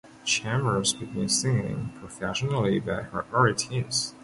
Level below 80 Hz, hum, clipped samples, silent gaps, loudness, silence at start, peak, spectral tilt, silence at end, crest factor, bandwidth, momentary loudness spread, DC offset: -54 dBFS; none; under 0.1%; none; -26 LUFS; 0.05 s; -8 dBFS; -4 dB/octave; 0 s; 20 dB; 11.5 kHz; 8 LU; under 0.1%